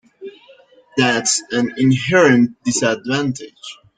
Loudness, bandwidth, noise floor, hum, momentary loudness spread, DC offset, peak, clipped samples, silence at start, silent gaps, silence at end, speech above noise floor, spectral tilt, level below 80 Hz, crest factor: -16 LUFS; 9.6 kHz; -48 dBFS; none; 22 LU; under 0.1%; -2 dBFS; under 0.1%; 0.2 s; none; 0.25 s; 32 dB; -4 dB/octave; -58 dBFS; 16 dB